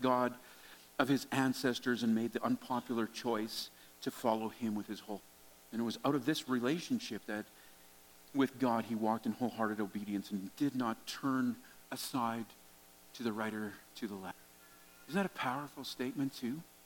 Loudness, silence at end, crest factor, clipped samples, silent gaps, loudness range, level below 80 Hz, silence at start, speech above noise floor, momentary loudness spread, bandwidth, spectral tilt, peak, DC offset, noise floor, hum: -37 LUFS; 0.2 s; 22 dB; under 0.1%; none; 6 LU; -76 dBFS; 0 s; 24 dB; 14 LU; 17.5 kHz; -5 dB/octave; -14 dBFS; under 0.1%; -60 dBFS; none